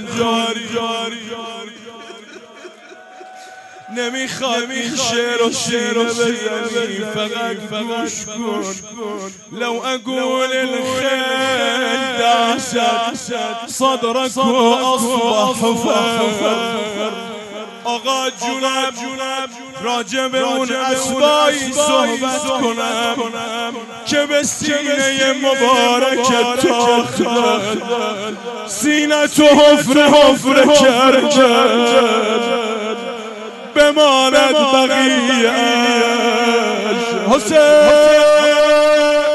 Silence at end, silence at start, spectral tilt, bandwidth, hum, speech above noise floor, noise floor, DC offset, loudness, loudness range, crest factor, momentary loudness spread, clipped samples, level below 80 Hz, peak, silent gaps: 0 s; 0 s; -2.5 dB/octave; 12.5 kHz; none; 24 dB; -39 dBFS; under 0.1%; -14 LUFS; 10 LU; 14 dB; 14 LU; under 0.1%; -54 dBFS; -2 dBFS; none